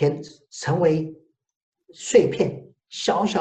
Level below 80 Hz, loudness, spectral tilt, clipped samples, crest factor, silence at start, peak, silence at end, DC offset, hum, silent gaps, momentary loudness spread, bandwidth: -62 dBFS; -22 LUFS; -5.5 dB/octave; under 0.1%; 20 dB; 0 s; -4 dBFS; 0 s; under 0.1%; none; 1.56-1.72 s; 18 LU; 9.2 kHz